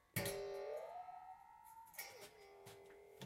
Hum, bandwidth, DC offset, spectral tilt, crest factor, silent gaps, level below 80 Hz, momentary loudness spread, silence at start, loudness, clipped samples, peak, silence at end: none; 16 kHz; under 0.1%; -3.5 dB/octave; 22 dB; none; -74 dBFS; 16 LU; 0 s; -51 LUFS; under 0.1%; -28 dBFS; 0 s